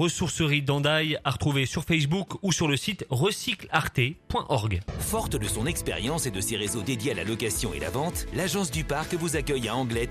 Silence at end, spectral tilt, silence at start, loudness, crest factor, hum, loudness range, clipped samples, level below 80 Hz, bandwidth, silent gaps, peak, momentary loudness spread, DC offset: 0 s; -4 dB/octave; 0 s; -27 LUFS; 20 dB; none; 3 LU; under 0.1%; -44 dBFS; 14.5 kHz; none; -8 dBFS; 5 LU; under 0.1%